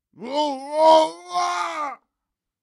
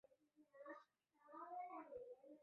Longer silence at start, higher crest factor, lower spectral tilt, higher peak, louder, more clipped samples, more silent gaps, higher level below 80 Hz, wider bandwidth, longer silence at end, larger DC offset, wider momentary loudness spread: about the same, 0.2 s vs 0.1 s; about the same, 18 dB vs 16 dB; second, -2 dB/octave vs -3.5 dB/octave; first, -4 dBFS vs -44 dBFS; first, -21 LUFS vs -58 LUFS; neither; neither; first, -72 dBFS vs under -90 dBFS; first, 11.5 kHz vs 5 kHz; first, 0.65 s vs 0 s; neither; first, 14 LU vs 9 LU